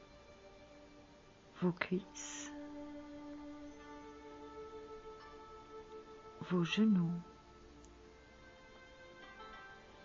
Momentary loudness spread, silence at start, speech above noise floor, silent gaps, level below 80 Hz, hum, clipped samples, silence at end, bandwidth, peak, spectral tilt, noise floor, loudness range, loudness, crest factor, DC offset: 24 LU; 0 s; 26 dB; none; -68 dBFS; none; under 0.1%; 0 s; 7.4 kHz; -16 dBFS; -5.5 dB/octave; -61 dBFS; 13 LU; -40 LUFS; 26 dB; under 0.1%